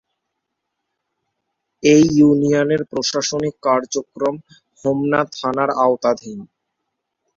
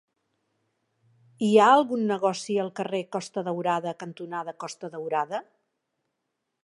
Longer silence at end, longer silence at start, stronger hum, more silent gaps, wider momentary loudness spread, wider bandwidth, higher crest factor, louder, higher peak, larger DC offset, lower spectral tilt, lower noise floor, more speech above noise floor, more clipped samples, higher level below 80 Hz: second, 0.9 s vs 1.25 s; first, 1.85 s vs 1.4 s; neither; neither; second, 13 LU vs 17 LU; second, 7.6 kHz vs 11.5 kHz; about the same, 18 dB vs 22 dB; first, -17 LUFS vs -26 LUFS; first, -2 dBFS vs -6 dBFS; neither; about the same, -5 dB/octave vs -5 dB/octave; second, -77 dBFS vs -81 dBFS; first, 60 dB vs 56 dB; neither; first, -56 dBFS vs -82 dBFS